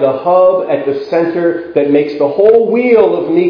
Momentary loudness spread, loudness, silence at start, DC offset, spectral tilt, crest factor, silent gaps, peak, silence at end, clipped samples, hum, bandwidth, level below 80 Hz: 6 LU; -11 LUFS; 0 s; under 0.1%; -9 dB/octave; 10 dB; none; 0 dBFS; 0 s; 0.2%; none; 5.4 kHz; -56 dBFS